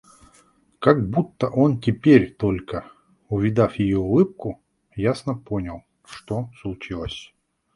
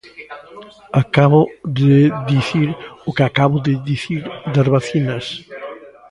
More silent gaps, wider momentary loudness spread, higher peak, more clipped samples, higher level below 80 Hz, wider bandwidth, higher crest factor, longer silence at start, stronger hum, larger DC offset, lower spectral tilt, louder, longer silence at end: neither; second, 17 LU vs 20 LU; about the same, -2 dBFS vs 0 dBFS; neither; about the same, -46 dBFS vs -50 dBFS; about the same, 11.5 kHz vs 10.5 kHz; first, 22 dB vs 16 dB; first, 0.8 s vs 0.05 s; neither; neither; about the same, -8 dB/octave vs -7.5 dB/octave; second, -22 LUFS vs -16 LUFS; first, 0.5 s vs 0.2 s